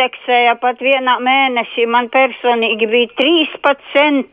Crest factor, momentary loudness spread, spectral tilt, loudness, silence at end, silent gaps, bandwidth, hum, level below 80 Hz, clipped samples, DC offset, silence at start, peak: 12 dB; 3 LU; -5 dB/octave; -13 LUFS; 0.05 s; none; 5.2 kHz; none; -66 dBFS; under 0.1%; under 0.1%; 0 s; -2 dBFS